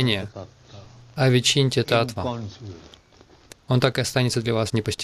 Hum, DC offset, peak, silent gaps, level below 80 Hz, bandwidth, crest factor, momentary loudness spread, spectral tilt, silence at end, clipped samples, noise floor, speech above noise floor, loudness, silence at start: none; under 0.1%; -6 dBFS; none; -54 dBFS; 14 kHz; 18 dB; 20 LU; -5 dB/octave; 0 s; under 0.1%; -53 dBFS; 30 dB; -22 LUFS; 0 s